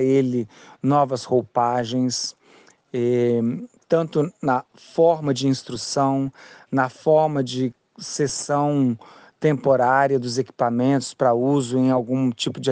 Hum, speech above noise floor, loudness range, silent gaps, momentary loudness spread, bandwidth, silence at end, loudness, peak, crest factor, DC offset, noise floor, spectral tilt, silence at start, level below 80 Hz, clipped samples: none; 33 dB; 3 LU; none; 8 LU; 9.8 kHz; 0 s; -22 LUFS; -4 dBFS; 16 dB; under 0.1%; -53 dBFS; -5.5 dB/octave; 0 s; -64 dBFS; under 0.1%